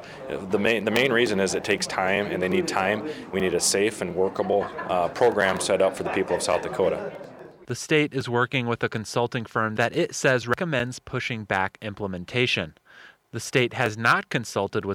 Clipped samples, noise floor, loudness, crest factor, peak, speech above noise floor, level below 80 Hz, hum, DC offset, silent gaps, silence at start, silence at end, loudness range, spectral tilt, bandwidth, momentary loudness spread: under 0.1%; -51 dBFS; -24 LUFS; 20 dB; -6 dBFS; 27 dB; -58 dBFS; none; under 0.1%; none; 0 s; 0 s; 3 LU; -4 dB/octave; 17 kHz; 9 LU